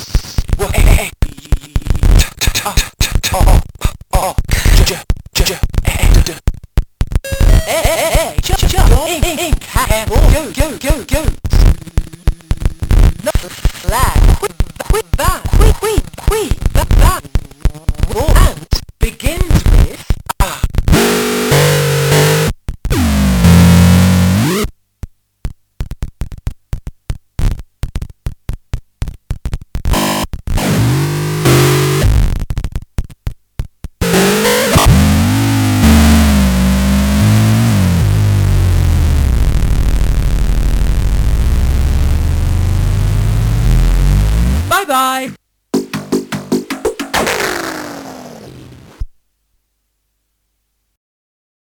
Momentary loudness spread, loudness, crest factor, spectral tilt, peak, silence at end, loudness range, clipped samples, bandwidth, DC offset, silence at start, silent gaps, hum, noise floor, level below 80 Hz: 16 LU; -13 LUFS; 12 dB; -5 dB/octave; 0 dBFS; 2.7 s; 9 LU; 0.4%; 20 kHz; under 0.1%; 0 s; none; none; -66 dBFS; -16 dBFS